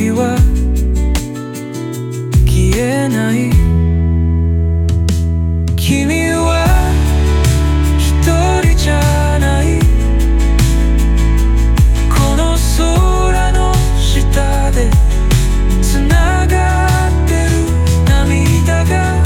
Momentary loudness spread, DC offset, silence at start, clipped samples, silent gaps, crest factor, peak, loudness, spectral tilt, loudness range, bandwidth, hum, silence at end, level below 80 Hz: 3 LU; under 0.1%; 0 s; under 0.1%; none; 10 dB; 0 dBFS; -13 LUFS; -6 dB/octave; 2 LU; 17 kHz; none; 0 s; -14 dBFS